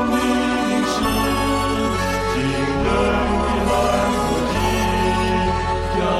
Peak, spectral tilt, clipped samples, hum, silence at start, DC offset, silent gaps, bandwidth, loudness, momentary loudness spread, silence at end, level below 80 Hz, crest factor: -6 dBFS; -5 dB/octave; under 0.1%; none; 0 s; under 0.1%; none; 13.5 kHz; -19 LUFS; 2 LU; 0 s; -30 dBFS; 14 dB